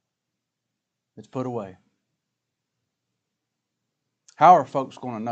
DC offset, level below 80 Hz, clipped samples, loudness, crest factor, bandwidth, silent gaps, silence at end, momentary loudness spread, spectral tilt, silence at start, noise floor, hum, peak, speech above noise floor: under 0.1%; -80 dBFS; under 0.1%; -20 LUFS; 24 dB; 7.8 kHz; none; 0 s; 20 LU; -6.5 dB/octave; 1.2 s; -83 dBFS; none; -2 dBFS; 62 dB